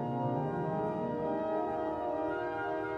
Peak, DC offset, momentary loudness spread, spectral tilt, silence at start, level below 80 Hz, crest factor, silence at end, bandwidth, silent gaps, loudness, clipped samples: -22 dBFS; under 0.1%; 2 LU; -9 dB/octave; 0 s; -62 dBFS; 12 dB; 0 s; 8 kHz; none; -34 LUFS; under 0.1%